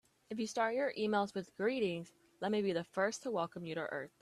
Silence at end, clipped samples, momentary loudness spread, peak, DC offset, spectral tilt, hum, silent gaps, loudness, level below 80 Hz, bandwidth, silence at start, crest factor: 0.15 s; under 0.1%; 8 LU; -20 dBFS; under 0.1%; -5 dB/octave; none; none; -37 LUFS; -80 dBFS; 13 kHz; 0.3 s; 18 dB